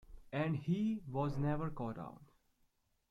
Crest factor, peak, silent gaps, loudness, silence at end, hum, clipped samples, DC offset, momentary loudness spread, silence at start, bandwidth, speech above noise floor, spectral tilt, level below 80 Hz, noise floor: 16 dB; -24 dBFS; none; -39 LUFS; 0.85 s; none; under 0.1%; under 0.1%; 8 LU; 0.1 s; 7.4 kHz; 40 dB; -9 dB/octave; -58 dBFS; -77 dBFS